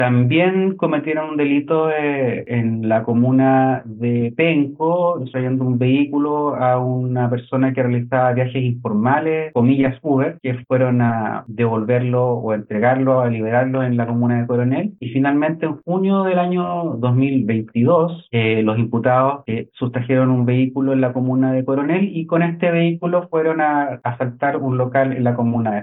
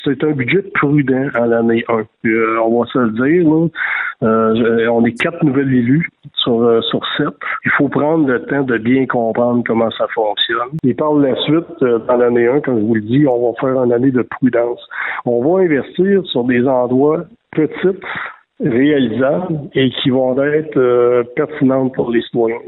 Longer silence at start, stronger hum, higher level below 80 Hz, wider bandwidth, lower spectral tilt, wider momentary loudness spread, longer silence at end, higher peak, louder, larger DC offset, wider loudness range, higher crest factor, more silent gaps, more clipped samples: about the same, 0 s vs 0 s; neither; second, -62 dBFS vs -54 dBFS; about the same, 4 kHz vs 4.1 kHz; first, -11.5 dB/octave vs -8.5 dB/octave; about the same, 5 LU vs 5 LU; about the same, 0 s vs 0 s; about the same, -4 dBFS vs -4 dBFS; second, -18 LUFS vs -15 LUFS; neither; about the same, 1 LU vs 1 LU; about the same, 14 dB vs 10 dB; neither; neither